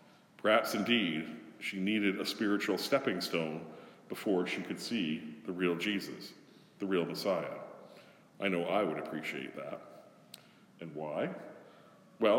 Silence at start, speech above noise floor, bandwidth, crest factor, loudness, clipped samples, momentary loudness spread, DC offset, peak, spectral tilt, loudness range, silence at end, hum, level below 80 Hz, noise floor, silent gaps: 0.4 s; 25 dB; 17.5 kHz; 22 dB; -34 LUFS; under 0.1%; 20 LU; under 0.1%; -14 dBFS; -5 dB/octave; 6 LU; 0 s; none; -86 dBFS; -59 dBFS; none